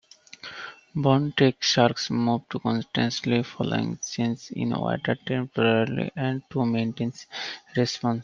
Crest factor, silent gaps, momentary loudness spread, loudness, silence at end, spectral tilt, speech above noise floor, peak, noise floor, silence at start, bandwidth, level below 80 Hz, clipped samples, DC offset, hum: 22 dB; none; 12 LU; -25 LUFS; 0 s; -5.5 dB/octave; 20 dB; -4 dBFS; -45 dBFS; 0.45 s; 7.4 kHz; -62 dBFS; under 0.1%; under 0.1%; none